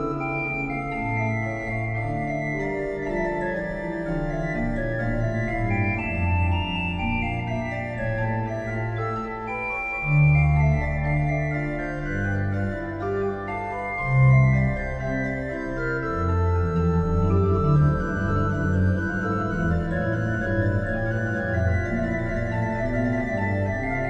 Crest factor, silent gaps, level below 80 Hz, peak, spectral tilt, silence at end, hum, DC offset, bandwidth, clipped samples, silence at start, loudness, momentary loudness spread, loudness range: 16 dB; none; -34 dBFS; -8 dBFS; -8.5 dB/octave; 0 s; none; under 0.1%; 7.6 kHz; under 0.1%; 0 s; -25 LUFS; 8 LU; 4 LU